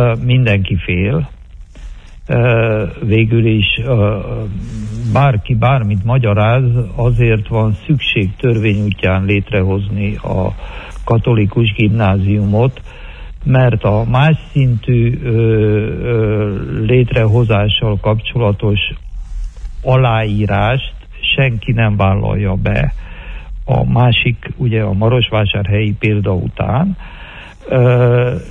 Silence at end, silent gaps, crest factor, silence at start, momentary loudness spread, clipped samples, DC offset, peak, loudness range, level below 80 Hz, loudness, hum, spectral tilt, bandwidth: 0 s; none; 12 dB; 0 s; 12 LU; under 0.1%; under 0.1%; -2 dBFS; 2 LU; -28 dBFS; -14 LUFS; none; -8.5 dB/octave; 4 kHz